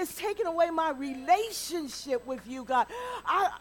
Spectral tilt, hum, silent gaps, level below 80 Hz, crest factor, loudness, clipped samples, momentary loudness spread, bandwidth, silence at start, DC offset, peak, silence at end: -2.5 dB/octave; 60 Hz at -60 dBFS; none; -62 dBFS; 18 dB; -30 LUFS; under 0.1%; 8 LU; 18 kHz; 0 s; under 0.1%; -12 dBFS; 0 s